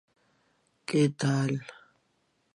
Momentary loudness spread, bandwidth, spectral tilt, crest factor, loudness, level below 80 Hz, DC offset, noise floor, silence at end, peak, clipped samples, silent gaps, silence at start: 17 LU; 11.5 kHz; -6.5 dB/octave; 18 dB; -28 LUFS; -76 dBFS; under 0.1%; -73 dBFS; 0.8 s; -12 dBFS; under 0.1%; none; 0.9 s